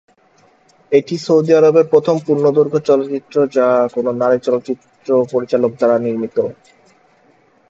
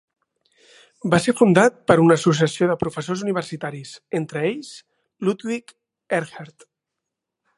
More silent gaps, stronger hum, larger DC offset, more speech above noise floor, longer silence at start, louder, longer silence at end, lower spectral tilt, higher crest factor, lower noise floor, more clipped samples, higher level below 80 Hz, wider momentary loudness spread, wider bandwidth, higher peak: neither; neither; neither; second, 39 dB vs 63 dB; second, 0.9 s vs 1.05 s; first, -15 LUFS vs -20 LUFS; about the same, 1.2 s vs 1.1 s; about the same, -7 dB/octave vs -6 dB/octave; second, 16 dB vs 22 dB; second, -53 dBFS vs -83 dBFS; neither; second, -64 dBFS vs -58 dBFS; second, 9 LU vs 16 LU; second, 7.8 kHz vs 11.5 kHz; about the same, 0 dBFS vs 0 dBFS